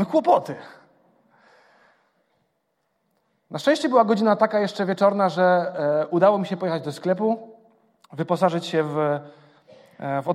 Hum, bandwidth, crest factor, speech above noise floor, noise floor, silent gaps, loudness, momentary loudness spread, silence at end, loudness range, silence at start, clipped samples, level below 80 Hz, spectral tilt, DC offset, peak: none; 12.5 kHz; 20 dB; 52 dB; -73 dBFS; none; -22 LUFS; 11 LU; 0 s; 7 LU; 0 s; under 0.1%; -76 dBFS; -6.5 dB/octave; under 0.1%; -4 dBFS